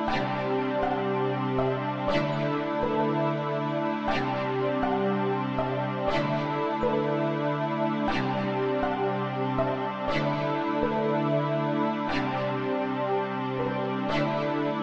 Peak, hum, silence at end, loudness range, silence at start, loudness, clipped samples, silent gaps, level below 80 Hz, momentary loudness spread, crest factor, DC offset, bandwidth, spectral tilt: -12 dBFS; none; 0 s; 0 LU; 0 s; -28 LUFS; under 0.1%; none; -50 dBFS; 2 LU; 16 dB; under 0.1%; 7.6 kHz; -7.5 dB/octave